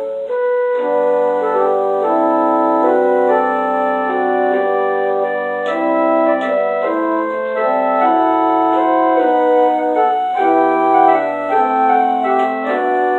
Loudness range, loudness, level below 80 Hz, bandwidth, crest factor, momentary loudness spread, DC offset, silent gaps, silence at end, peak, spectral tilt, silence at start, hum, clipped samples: 2 LU; -15 LUFS; -64 dBFS; 7.6 kHz; 14 dB; 4 LU; under 0.1%; none; 0 s; 0 dBFS; -6.5 dB/octave; 0 s; none; under 0.1%